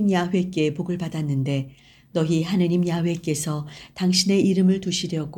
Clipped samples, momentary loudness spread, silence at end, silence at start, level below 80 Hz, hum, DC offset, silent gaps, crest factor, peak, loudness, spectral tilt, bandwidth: under 0.1%; 10 LU; 0 s; 0 s; -56 dBFS; none; under 0.1%; none; 16 dB; -6 dBFS; -23 LUFS; -5.5 dB/octave; 17.5 kHz